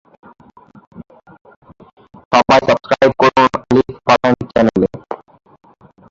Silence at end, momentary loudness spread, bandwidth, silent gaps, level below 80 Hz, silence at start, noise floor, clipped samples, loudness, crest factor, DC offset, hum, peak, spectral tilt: 0.95 s; 9 LU; 7.6 kHz; 1.41-1.45 s, 1.56-1.62 s, 1.93-1.97 s, 2.25-2.31 s; -46 dBFS; 0.95 s; -30 dBFS; under 0.1%; -13 LUFS; 16 dB; under 0.1%; none; 0 dBFS; -5.5 dB/octave